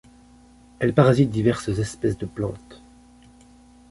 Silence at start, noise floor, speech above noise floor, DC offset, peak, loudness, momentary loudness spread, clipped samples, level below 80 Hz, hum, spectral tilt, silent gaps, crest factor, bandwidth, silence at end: 0.8 s; -51 dBFS; 30 dB; under 0.1%; -2 dBFS; -22 LUFS; 13 LU; under 0.1%; -48 dBFS; none; -7.5 dB/octave; none; 22 dB; 11.5 kHz; 1.15 s